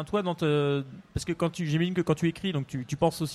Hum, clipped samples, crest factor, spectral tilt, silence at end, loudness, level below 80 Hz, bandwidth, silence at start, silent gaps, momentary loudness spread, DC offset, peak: none; under 0.1%; 16 dB; -6.5 dB/octave; 0 s; -29 LUFS; -52 dBFS; 14.5 kHz; 0 s; none; 7 LU; under 0.1%; -12 dBFS